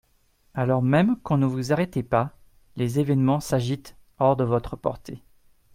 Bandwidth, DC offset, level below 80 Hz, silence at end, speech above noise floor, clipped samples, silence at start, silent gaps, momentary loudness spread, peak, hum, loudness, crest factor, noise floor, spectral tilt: 16 kHz; under 0.1%; -52 dBFS; 0.55 s; 40 dB; under 0.1%; 0.55 s; none; 13 LU; -6 dBFS; none; -24 LUFS; 18 dB; -63 dBFS; -7.5 dB/octave